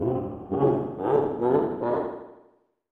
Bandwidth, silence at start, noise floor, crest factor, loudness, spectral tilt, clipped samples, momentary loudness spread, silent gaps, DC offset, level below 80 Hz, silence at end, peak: 4.3 kHz; 0 s; -62 dBFS; 16 dB; -26 LUFS; -10.5 dB/octave; under 0.1%; 7 LU; none; under 0.1%; -56 dBFS; 0.6 s; -10 dBFS